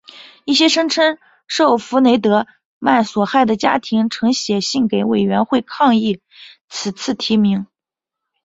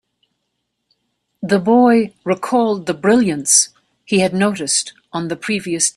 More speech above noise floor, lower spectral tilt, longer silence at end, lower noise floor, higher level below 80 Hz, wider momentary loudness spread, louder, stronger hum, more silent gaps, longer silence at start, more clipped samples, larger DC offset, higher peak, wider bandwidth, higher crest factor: first, 70 dB vs 57 dB; about the same, -4.5 dB/octave vs -3.5 dB/octave; first, 0.8 s vs 0.05 s; first, -85 dBFS vs -73 dBFS; about the same, -58 dBFS vs -60 dBFS; about the same, 11 LU vs 11 LU; about the same, -16 LUFS vs -16 LUFS; neither; first, 2.65-2.81 s, 6.61-6.68 s vs none; second, 0.15 s vs 1.4 s; neither; neither; about the same, -2 dBFS vs 0 dBFS; second, 8 kHz vs 14 kHz; about the same, 16 dB vs 18 dB